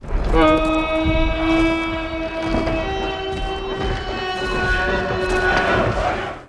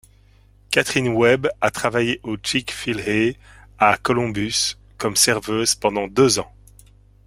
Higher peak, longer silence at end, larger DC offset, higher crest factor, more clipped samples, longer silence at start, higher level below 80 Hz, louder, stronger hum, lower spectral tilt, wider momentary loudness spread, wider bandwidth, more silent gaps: second, -4 dBFS vs 0 dBFS; second, 0 s vs 0.8 s; neither; second, 16 dB vs 22 dB; neither; second, 0 s vs 0.7 s; first, -26 dBFS vs -48 dBFS; about the same, -20 LUFS vs -20 LUFS; second, none vs 50 Hz at -45 dBFS; first, -6 dB/octave vs -3 dB/octave; about the same, 8 LU vs 7 LU; second, 11 kHz vs 16.5 kHz; neither